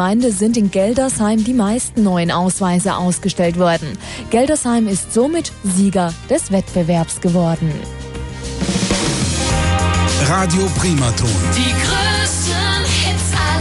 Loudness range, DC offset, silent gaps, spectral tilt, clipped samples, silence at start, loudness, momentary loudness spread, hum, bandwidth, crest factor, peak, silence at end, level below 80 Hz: 3 LU; under 0.1%; none; -4.5 dB/octave; under 0.1%; 0 s; -16 LUFS; 5 LU; none; 12 kHz; 12 dB; -4 dBFS; 0 s; -32 dBFS